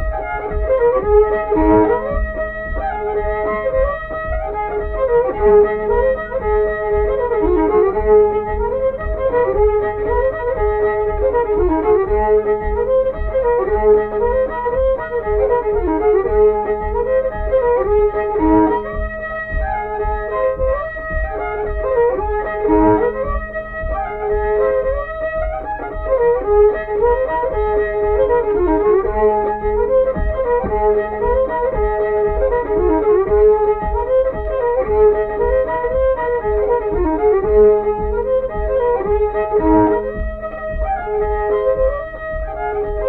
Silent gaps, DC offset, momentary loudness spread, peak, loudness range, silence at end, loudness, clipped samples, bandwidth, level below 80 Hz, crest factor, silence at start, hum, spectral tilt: none; under 0.1%; 9 LU; -2 dBFS; 3 LU; 0 s; -17 LUFS; under 0.1%; 4 kHz; -26 dBFS; 14 dB; 0 s; none; -10.5 dB/octave